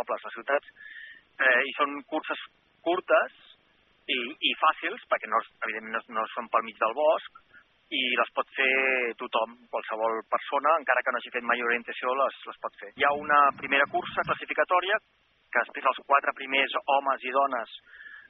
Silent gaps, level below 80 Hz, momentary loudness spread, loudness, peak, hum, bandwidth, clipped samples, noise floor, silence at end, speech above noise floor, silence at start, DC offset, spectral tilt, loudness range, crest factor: none; -74 dBFS; 12 LU; -27 LUFS; -6 dBFS; none; 5.4 kHz; under 0.1%; -65 dBFS; 0.1 s; 37 dB; 0 s; under 0.1%; 1 dB/octave; 3 LU; 22 dB